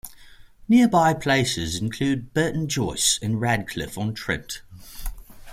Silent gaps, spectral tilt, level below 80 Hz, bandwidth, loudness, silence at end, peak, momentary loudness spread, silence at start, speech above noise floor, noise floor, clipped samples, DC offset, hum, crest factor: none; -4 dB/octave; -42 dBFS; 16 kHz; -22 LUFS; 0 s; -6 dBFS; 20 LU; 0.05 s; 24 dB; -47 dBFS; under 0.1%; under 0.1%; none; 18 dB